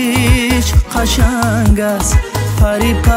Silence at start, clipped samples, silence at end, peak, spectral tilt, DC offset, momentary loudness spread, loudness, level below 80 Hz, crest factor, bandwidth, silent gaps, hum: 0 s; under 0.1%; 0 s; 0 dBFS; -5 dB/octave; under 0.1%; 3 LU; -13 LUFS; -16 dBFS; 12 dB; 16.5 kHz; none; none